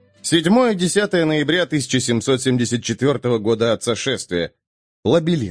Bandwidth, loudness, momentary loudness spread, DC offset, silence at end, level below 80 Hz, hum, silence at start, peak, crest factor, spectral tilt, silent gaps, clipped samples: 10.5 kHz; -18 LUFS; 6 LU; under 0.1%; 0 s; -56 dBFS; none; 0.25 s; -2 dBFS; 16 dB; -4.5 dB/octave; 4.67-5.03 s; under 0.1%